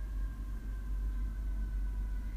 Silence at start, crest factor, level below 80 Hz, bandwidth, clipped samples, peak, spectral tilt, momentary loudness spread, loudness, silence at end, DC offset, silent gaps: 0 s; 8 dB; -36 dBFS; 4 kHz; under 0.1%; -28 dBFS; -7.5 dB/octave; 3 LU; -41 LUFS; 0 s; under 0.1%; none